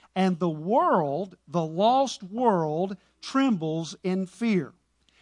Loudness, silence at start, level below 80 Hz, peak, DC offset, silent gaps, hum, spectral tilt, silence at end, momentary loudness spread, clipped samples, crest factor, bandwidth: -26 LUFS; 0.15 s; -72 dBFS; -8 dBFS; under 0.1%; none; none; -6.5 dB/octave; 0.55 s; 9 LU; under 0.1%; 18 dB; 11 kHz